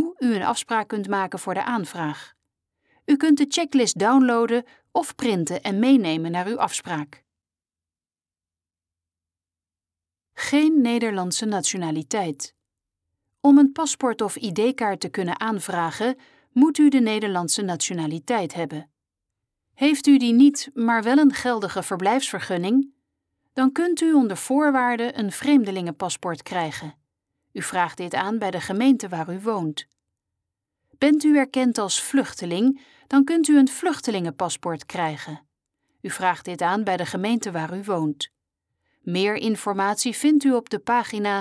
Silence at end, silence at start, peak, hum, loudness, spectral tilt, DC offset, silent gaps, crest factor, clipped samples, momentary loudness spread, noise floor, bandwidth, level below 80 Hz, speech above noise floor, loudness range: 0 s; 0 s; -6 dBFS; none; -22 LUFS; -4.5 dB/octave; under 0.1%; none; 16 dB; under 0.1%; 12 LU; under -90 dBFS; 11 kHz; -70 dBFS; over 69 dB; 6 LU